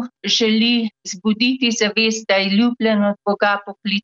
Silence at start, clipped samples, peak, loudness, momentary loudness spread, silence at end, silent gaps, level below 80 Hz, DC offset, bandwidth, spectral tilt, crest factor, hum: 0 s; under 0.1%; -4 dBFS; -17 LUFS; 7 LU; 0.05 s; none; -64 dBFS; under 0.1%; 7.8 kHz; -3.5 dB/octave; 14 dB; none